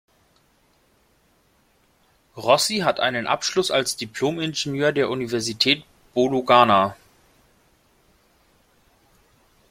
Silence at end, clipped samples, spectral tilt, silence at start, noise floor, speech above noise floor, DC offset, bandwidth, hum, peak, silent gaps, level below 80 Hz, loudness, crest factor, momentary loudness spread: 2.75 s; under 0.1%; -3.5 dB/octave; 2.35 s; -62 dBFS; 41 dB; under 0.1%; 16.5 kHz; none; -2 dBFS; none; -62 dBFS; -21 LUFS; 22 dB; 9 LU